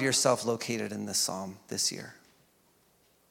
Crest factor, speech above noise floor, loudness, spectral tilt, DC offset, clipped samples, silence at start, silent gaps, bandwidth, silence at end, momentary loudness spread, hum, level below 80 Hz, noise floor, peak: 22 dB; 36 dB; -30 LUFS; -2.5 dB/octave; under 0.1%; under 0.1%; 0 s; none; 17.5 kHz; 1.2 s; 14 LU; none; -78 dBFS; -67 dBFS; -10 dBFS